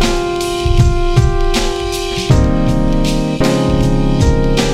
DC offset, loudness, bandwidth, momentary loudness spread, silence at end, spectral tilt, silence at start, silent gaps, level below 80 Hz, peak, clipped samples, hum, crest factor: under 0.1%; -14 LUFS; 14.5 kHz; 4 LU; 0 s; -6 dB/octave; 0 s; none; -16 dBFS; 0 dBFS; under 0.1%; none; 12 dB